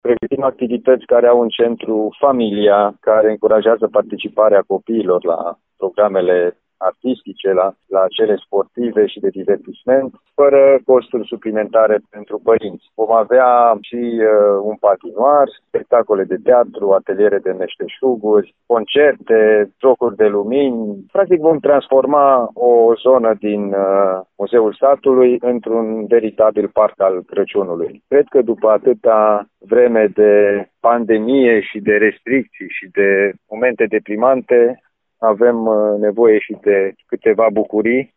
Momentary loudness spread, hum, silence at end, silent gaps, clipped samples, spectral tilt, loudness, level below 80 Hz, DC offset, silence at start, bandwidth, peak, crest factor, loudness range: 9 LU; none; 0.15 s; none; under 0.1%; -10.5 dB/octave; -14 LUFS; -60 dBFS; under 0.1%; 0.05 s; 4 kHz; 0 dBFS; 12 dB; 3 LU